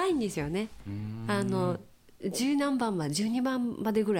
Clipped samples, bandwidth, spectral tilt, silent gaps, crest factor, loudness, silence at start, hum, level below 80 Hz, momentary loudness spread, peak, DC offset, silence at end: under 0.1%; 16.5 kHz; -5.5 dB/octave; none; 14 dB; -31 LUFS; 0 s; none; -58 dBFS; 10 LU; -16 dBFS; under 0.1%; 0 s